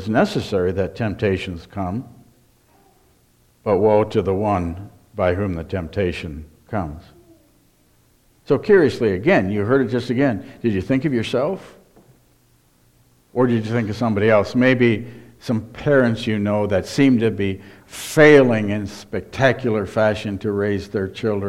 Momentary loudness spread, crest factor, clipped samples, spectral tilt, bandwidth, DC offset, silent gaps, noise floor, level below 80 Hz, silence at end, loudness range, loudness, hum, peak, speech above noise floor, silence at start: 14 LU; 20 dB; under 0.1%; -7 dB/octave; 14.5 kHz; under 0.1%; none; -57 dBFS; -48 dBFS; 0 s; 8 LU; -19 LUFS; none; 0 dBFS; 39 dB; 0 s